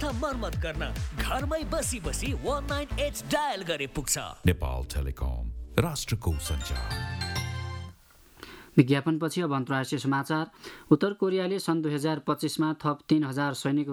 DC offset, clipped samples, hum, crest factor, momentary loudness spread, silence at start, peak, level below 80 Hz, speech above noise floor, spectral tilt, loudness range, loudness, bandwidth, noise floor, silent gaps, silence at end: under 0.1%; under 0.1%; none; 24 dB; 8 LU; 0 s; -4 dBFS; -38 dBFS; 27 dB; -5 dB/octave; 4 LU; -29 LUFS; 19.5 kHz; -55 dBFS; none; 0 s